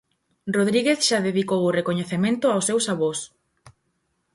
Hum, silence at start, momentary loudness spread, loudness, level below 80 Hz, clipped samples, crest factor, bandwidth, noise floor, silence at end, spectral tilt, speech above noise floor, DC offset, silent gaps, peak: none; 0.45 s; 7 LU; -22 LUFS; -66 dBFS; under 0.1%; 16 dB; 11.5 kHz; -72 dBFS; 0.65 s; -4 dB/octave; 50 dB; under 0.1%; none; -6 dBFS